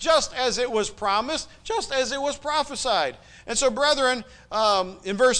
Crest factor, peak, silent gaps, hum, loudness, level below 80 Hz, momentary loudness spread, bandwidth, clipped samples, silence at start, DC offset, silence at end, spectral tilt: 16 dB; -8 dBFS; none; none; -24 LUFS; -50 dBFS; 9 LU; 10.5 kHz; under 0.1%; 0 s; under 0.1%; 0 s; -1.5 dB/octave